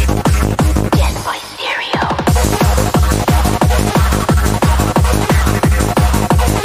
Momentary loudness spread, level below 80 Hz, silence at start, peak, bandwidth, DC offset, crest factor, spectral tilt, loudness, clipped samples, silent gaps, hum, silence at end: 4 LU; -16 dBFS; 0 s; 0 dBFS; 16 kHz; under 0.1%; 12 dB; -5.5 dB/octave; -14 LUFS; under 0.1%; none; none; 0 s